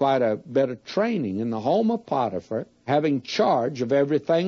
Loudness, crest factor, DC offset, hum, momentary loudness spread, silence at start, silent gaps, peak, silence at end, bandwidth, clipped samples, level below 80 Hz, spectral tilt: -24 LUFS; 16 dB; under 0.1%; none; 5 LU; 0 s; none; -8 dBFS; 0 s; 7.4 kHz; under 0.1%; -70 dBFS; -6.5 dB/octave